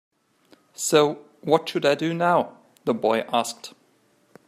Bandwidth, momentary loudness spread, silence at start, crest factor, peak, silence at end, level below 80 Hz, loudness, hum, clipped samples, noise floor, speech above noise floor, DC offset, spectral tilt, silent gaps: 15.5 kHz; 13 LU; 0.8 s; 20 dB; -4 dBFS; 0.8 s; -72 dBFS; -23 LUFS; none; under 0.1%; -63 dBFS; 41 dB; under 0.1%; -4 dB/octave; none